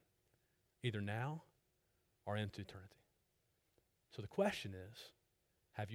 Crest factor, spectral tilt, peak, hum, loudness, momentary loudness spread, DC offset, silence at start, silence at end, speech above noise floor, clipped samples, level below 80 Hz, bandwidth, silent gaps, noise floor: 22 dB; -6 dB/octave; -26 dBFS; none; -45 LUFS; 17 LU; under 0.1%; 0.85 s; 0 s; 38 dB; under 0.1%; -76 dBFS; 16.5 kHz; none; -82 dBFS